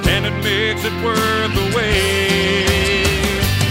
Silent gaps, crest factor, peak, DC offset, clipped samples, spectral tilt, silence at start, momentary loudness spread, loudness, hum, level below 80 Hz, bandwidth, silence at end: none; 16 dB; -2 dBFS; under 0.1%; under 0.1%; -4 dB/octave; 0 s; 3 LU; -16 LUFS; none; -28 dBFS; 16.5 kHz; 0 s